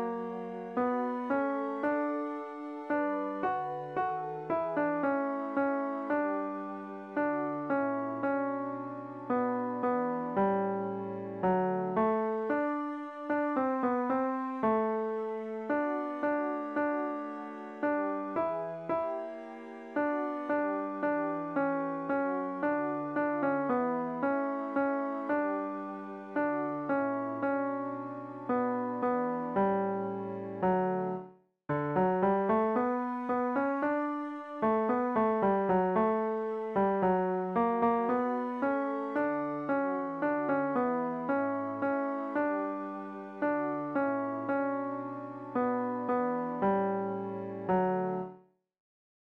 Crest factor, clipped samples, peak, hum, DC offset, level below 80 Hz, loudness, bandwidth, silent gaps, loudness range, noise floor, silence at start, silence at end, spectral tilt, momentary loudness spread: 14 dB; under 0.1%; -18 dBFS; none; under 0.1%; -70 dBFS; -32 LUFS; 5.4 kHz; none; 4 LU; -56 dBFS; 0 s; 0.95 s; -9.5 dB/octave; 9 LU